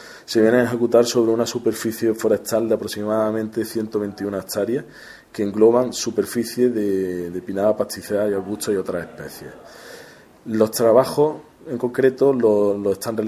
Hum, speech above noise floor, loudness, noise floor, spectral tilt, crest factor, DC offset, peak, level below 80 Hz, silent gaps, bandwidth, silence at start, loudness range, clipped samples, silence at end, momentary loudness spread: none; 25 dB; -20 LUFS; -45 dBFS; -5 dB/octave; 18 dB; under 0.1%; -2 dBFS; -56 dBFS; none; 16 kHz; 0 s; 5 LU; under 0.1%; 0 s; 17 LU